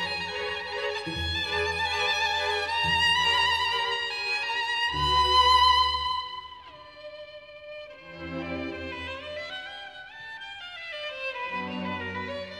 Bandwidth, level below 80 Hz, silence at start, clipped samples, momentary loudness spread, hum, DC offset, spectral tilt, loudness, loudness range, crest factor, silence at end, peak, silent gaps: 13.5 kHz; -48 dBFS; 0 s; under 0.1%; 21 LU; none; under 0.1%; -2.5 dB/octave; -26 LUFS; 14 LU; 18 dB; 0 s; -10 dBFS; none